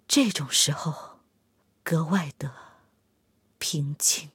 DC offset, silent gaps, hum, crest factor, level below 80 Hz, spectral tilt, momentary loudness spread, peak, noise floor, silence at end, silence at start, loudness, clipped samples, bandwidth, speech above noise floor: under 0.1%; none; none; 20 dB; -72 dBFS; -3 dB/octave; 16 LU; -8 dBFS; -69 dBFS; 0.05 s; 0.1 s; -25 LUFS; under 0.1%; 16.5 kHz; 43 dB